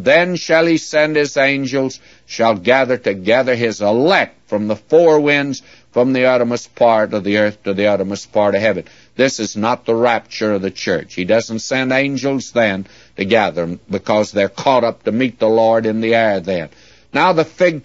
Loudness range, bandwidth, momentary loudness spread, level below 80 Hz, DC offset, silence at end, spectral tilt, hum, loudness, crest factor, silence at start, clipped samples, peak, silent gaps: 3 LU; 8 kHz; 9 LU; -58 dBFS; 0.2%; 0.05 s; -5 dB/octave; none; -16 LUFS; 16 dB; 0 s; under 0.1%; 0 dBFS; none